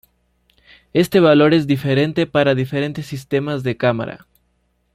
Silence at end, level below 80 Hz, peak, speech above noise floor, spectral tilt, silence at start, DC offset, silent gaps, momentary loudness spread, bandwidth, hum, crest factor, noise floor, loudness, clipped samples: 0.8 s; -54 dBFS; -2 dBFS; 48 dB; -7 dB/octave; 0.95 s; under 0.1%; none; 11 LU; 15.5 kHz; 60 Hz at -50 dBFS; 16 dB; -65 dBFS; -17 LUFS; under 0.1%